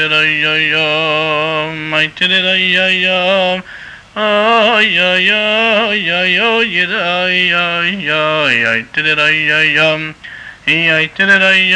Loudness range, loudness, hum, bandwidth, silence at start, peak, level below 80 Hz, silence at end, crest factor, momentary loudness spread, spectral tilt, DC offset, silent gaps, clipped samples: 2 LU; -11 LUFS; none; 10.5 kHz; 0 s; -2 dBFS; -52 dBFS; 0 s; 12 dB; 7 LU; -4 dB/octave; under 0.1%; none; under 0.1%